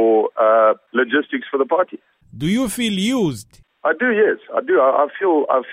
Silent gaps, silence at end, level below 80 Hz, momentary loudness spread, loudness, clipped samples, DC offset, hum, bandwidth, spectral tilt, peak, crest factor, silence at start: none; 0 s; -54 dBFS; 8 LU; -18 LUFS; under 0.1%; under 0.1%; none; 16 kHz; -5 dB/octave; -2 dBFS; 14 dB; 0 s